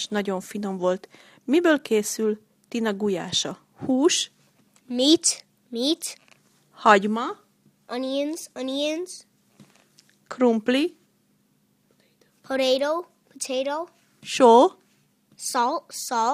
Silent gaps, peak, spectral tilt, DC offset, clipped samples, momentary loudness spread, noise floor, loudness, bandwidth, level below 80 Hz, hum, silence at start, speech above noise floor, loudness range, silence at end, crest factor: none; -2 dBFS; -3 dB/octave; under 0.1%; under 0.1%; 16 LU; -66 dBFS; -23 LUFS; 15.5 kHz; -72 dBFS; none; 0 s; 43 dB; 6 LU; 0 s; 24 dB